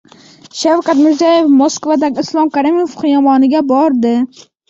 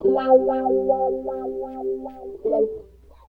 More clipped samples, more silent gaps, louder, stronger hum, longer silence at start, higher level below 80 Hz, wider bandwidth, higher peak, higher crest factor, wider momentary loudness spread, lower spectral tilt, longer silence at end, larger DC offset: neither; neither; first, -12 LUFS vs -22 LUFS; neither; first, 0.55 s vs 0 s; second, -58 dBFS vs -52 dBFS; first, 7.8 kHz vs 4.6 kHz; about the same, -2 dBFS vs -4 dBFS; second, 10 dB vs 18 dB; second, 6 LU vs 13 LU; second, -4 dB/octave vs -8.5 dB/octave; about the same, 0.45 s vs 0.5 s; neither